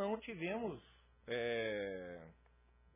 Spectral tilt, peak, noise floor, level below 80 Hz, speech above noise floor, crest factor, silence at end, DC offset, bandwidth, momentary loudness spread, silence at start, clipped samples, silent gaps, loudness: -3.5 dB/octave; -28 dBFS; -69 dBFS; -68 dBFS; 26 dB; 16 dB; 0.6 s; under 0.1%; 3.8 kHz; 17 LU; 0 s; under 0.1%; none; -42 LUFS